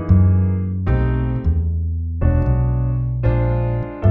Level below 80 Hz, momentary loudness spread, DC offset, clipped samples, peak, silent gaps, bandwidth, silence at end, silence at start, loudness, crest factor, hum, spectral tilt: -24 dBFS; 6 LU; under 0.1%; under 0.1%; -2 dBFS; none; 3.4 kHz; 0 s; 0 s; -19 LUFS; 14 dB; none; -12 dB/octave